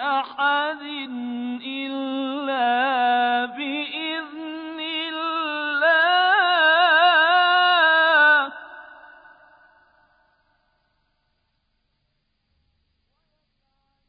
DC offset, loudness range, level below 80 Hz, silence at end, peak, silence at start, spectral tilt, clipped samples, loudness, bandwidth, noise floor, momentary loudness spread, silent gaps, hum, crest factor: under 0.1%; 8 LU; -74 dBFS; 5.15 s; -6 dBFS; 0 s; -5.5 dB/octave; under 0.1%; -19 LUFS; 5 kHz; -72 dBFS; 15 LU; none; none; 16 dB